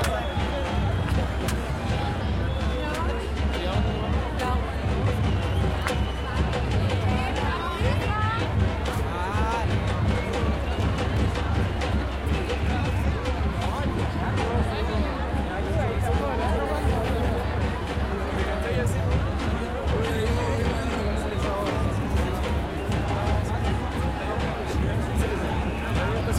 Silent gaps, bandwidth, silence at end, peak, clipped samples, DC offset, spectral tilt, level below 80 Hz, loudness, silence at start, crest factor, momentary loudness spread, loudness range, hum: none; 14 kHz; 0 s; -8 dBFS; under 0.1%; under 0.1%; -6.5 dB/octave; -30 dBFS; -26 LUFS; 0 s; 16 dB; 3 LU; 1 LU; none